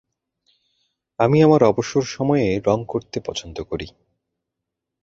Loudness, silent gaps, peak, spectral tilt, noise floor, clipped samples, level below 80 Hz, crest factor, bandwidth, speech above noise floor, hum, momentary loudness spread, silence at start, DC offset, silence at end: -20 LUFS; none; 0 dBFS; -6.5 dB/octave; -82 dBFS; under 0.1%; -50 dBFS; 20 dB; 7.8 kHz; 63 dB; none; 16 LU; 1.2 s; under 0.1%; 1.15 s